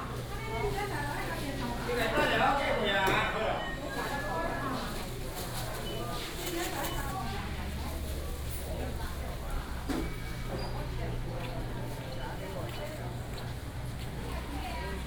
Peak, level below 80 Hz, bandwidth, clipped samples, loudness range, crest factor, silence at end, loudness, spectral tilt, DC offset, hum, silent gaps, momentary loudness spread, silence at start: -14 dBFS; -40 dBFS; over 20 kHz; under 0.1%; 8 LU; 20 dB; 0 s; -34 LUFS; -4.5 dB/octave; under 0.1%; none; none; 11 LU; 0 s